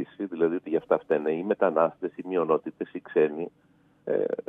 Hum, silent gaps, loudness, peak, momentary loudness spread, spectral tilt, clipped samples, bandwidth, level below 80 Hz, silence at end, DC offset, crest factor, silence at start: none; none; -27 LUFS; -8 dBFS; 11 LU; -9 dB/octave; under 0.1%; 3.8 kHz; -78 dBFS; 0.1 s; under 0.1%; 18 dB; 0 s